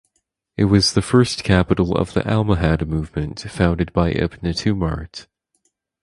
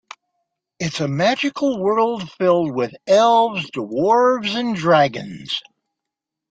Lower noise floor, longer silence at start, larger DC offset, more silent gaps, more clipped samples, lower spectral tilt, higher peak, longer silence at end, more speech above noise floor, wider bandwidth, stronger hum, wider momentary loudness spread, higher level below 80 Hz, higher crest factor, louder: second, -71 dBFS vs -84 dBFS; second, 0.6 s vs 0.8 s; neither; neither; neither; about the same, -6 dB/octave vs -5 dB/octave; about the same, 0 dBFS vs -2 dBFS; about the same, 0.8 s vs 0.9 s; second, 53 dB vs 66 dB; first, 11.5 kHz vs 9.2 kHz; neither; about the same, 11 LU vs 11 LU; first, -32 dBFS vs -62 dBFS; about the same, 20 dB vs 16 dB; about the same, -19 LUFS vs -18 LUFS